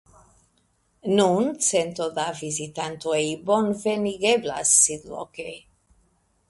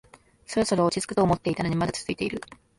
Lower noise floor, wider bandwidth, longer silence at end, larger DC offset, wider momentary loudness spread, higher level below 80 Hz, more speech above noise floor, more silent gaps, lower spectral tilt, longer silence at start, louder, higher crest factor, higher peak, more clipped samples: first, -67 dBFS vs -45 dBFS; about the same, 12 kHz vs 11.5 kHz; first, 0.9 s vs 0.35 s; neither; first, 18 LU vs 7 LU; second, -62 dBFS vs -52 dBFS; first, 43 dB vs 20 dB; neither; second, -3 dB/octave vs -5.5 dB/octave; first, 1.05 s vs 0.5 s; first, -22 LUFS vs -26 LUFS; first, 22 dB vs 16 dB; first, -4 dBFS vs -10 dBFS; neither